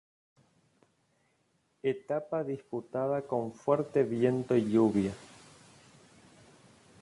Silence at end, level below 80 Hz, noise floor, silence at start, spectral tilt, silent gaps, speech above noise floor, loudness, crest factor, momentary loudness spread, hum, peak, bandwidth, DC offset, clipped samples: 1.75 s; -68 dBFS; -74 dBFS; 1.85 s; -8 dB/octave; none; 44 dB; -31 LUFS; 20 dB; 10 LU; none; -12 dBFS; 11.5 kHz; under 0.1%; under 0.1%